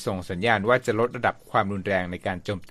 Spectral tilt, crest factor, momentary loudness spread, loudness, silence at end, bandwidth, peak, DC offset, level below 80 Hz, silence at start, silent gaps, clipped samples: -6 dB/octave; 20 dB; 9 LU; -25 LUFS; 0.05 s; 14 kHz; -4 dBFS; under 0.1%; -54 dBFS; 0 s; none; under 0.1%